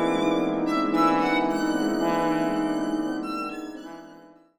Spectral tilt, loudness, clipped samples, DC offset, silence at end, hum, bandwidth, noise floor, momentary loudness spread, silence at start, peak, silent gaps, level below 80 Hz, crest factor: -5.5 dB/octave; -25 LUFS; under 0.1%; under 0.1%; 0.3 s; none; 14.5 kHz; -50 dBFS; 15 LU; 0 s; -10 dBFS; none; -56 dBFS; 16 dB